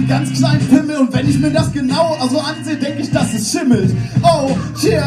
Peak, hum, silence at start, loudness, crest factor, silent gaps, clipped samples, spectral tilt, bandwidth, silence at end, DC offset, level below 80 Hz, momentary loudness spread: 0 dBFS; none; 0 s; -15 LUFS; 14 dB; none; under 0.1%; -6 dB/octave; 13 kHz; 0 s; under 0.1%; -40 dBFS; 6 LU